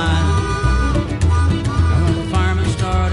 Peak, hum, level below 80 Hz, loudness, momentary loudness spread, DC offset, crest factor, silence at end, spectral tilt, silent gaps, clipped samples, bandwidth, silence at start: -4 dBFS; none; -20 dBFS; -17 LUFS; 2 LU; under 0.1%; 12 dB; 0 s; -6 dB/octave; none; under 0.1%; 11.5 kHz; 0 s